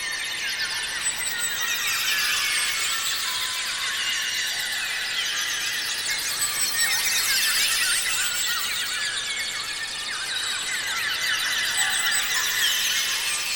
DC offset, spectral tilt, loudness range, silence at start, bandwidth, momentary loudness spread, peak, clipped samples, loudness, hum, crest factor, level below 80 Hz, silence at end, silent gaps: under 0.1%; 2.5 dB/octave; 3 LU; 0 s; 18 kHz; 6 LU; -10 dBFS; under 0.1%; -22 LUFS; none; 16 dB; -58 dBFS; 0 s; none